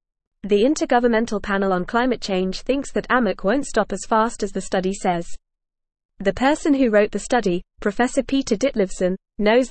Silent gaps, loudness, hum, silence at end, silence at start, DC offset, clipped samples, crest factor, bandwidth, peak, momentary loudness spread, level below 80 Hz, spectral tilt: 6.05-6.09 s; -21 LUFS; none; 0 s; 0.45 s; 0.3%; under 0.1%; 16 dB; 8.8 kHz; -4 dBFS; 7 LU; -42 dBFS; -5 dB/octave